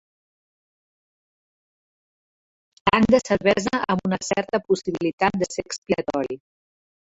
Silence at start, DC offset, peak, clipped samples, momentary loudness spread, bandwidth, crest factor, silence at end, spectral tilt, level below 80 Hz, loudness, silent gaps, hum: 2.85 s; under 0.1%; -2 dBFS; under 0.1%; 9 LU; 8 kHz; 24 dB; 0.7 s; -5 dB/octave; -54 dBFS; -22 LUFS; 5.13-5.18 s, 5.78-5.82 s; none